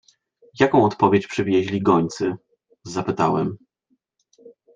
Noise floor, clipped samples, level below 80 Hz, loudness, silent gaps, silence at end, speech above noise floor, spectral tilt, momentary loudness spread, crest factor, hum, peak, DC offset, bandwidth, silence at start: -69 dBFS; under 0.1%; -60 dBFS; -20 LUFS; none; 0.25 s; 50 dB; -6.5 dB/octave; 12 LU; 20 dB; none; -2 dBFS; under 0.1%; 9.4 kHz; 0.55 s